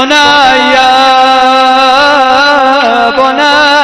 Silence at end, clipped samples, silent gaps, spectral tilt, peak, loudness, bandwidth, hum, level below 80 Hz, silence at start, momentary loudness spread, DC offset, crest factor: 0 s; 8%; none; -2 dB/octave; 0 dBFS; -5 LUFS; 11 kHz; none; -40 dBFS; 0 s; 3 LU; under 0.1%; 6 dB